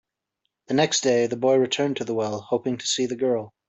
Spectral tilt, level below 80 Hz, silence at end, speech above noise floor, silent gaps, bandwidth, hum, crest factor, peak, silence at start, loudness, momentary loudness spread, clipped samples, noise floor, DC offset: -3.5 dB/octave; -68 dBFS; 0.2 s; 56 dB; none; 8.4 kHz; none; 18 dB; -6 dBFS; 0.7 s; -23 LUFS; 6 LU; under 0.1%; -79 dBFS; under 0.1%